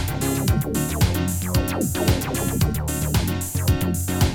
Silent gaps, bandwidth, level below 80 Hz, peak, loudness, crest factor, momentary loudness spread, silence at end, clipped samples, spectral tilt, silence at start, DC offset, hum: none; 19 kHz; -30 dBFS; -6 dBFS; -22 LUFS; 16 dB; 2 LU; 0 s; under 0.1%; -5 dB/octave; 0 s; under 0.1%; none